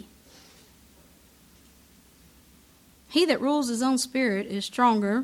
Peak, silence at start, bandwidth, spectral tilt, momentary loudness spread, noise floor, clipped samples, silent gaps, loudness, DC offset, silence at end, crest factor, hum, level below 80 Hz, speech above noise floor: -8 dBFS; 3.1 s; 18 kHz; -4 dB/octave; 6 LU; -57 dBFS; under 0.1%; none; -25 LUFS; under 0.1%; 0 s; 20 dB; none; -64 dBFS; 33 dB